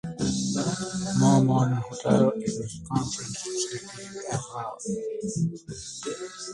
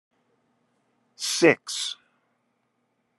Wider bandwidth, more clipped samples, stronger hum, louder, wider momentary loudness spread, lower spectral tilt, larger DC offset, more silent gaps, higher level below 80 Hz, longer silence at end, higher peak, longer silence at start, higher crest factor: about the same, 11.5 kHz vs 12.5 kHz; neither; neither; second, -27 LUFS vs -23 LUFS; about the same, 14 LU vs 12 LU; first, -5.5 dB/octave vs -3 dB/octave; neither; neither; first, -54 dBFS vs -80 dBFS; second, 0 s vs 1.25 s; about the same, -6 dBFS vs -4 dBFS; second, 0.05 s vs 1.2 s; second, 20 dB vs 26 dB